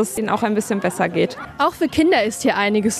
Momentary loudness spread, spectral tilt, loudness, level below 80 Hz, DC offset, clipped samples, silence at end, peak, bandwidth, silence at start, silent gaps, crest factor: 5 LU; -4.5 dB/octave; -19 LUFS; -50 dBFS; under 0.1%; under 0.1%; 0 s; -4 dBFS; 14 kHz; 0 s; none; 14 dB